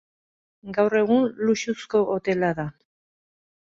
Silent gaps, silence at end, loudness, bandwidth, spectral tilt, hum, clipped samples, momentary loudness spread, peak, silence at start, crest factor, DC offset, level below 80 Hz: none; 0.9 s; -23 LUFS; 7.6 kHz; -6 dB/octave; none; under 0.1%; 10 LU; -8 dBFS; 0.65 s; 16 dB; under 0.1%; -62 dBFS